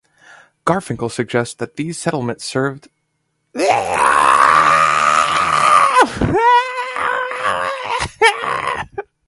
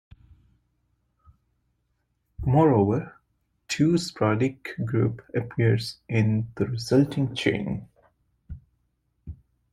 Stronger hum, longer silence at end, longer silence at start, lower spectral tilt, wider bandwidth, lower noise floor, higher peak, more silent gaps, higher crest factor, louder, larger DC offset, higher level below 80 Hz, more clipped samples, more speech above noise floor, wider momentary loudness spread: neither; second, 0.25 s vs 0.4 s; second, 0.65 s vs 2.4 s; second, -3.5 dB/octave vs -7 dB/octave; about the same, 11.5 kHz vs 12.5 kHz; second, -69 dBFS vs -74 dBFS; first, 0 dBFS vs -6 dBFS; neither; about the same, 16 dB vs 20 dB; first, -15 LUFS vs -25 LUFS; neither; first, -42 dBFS vs -52 dBFS; neither; about the same, 48 dB vs 50 dB; second, 13 LU vs 24 LU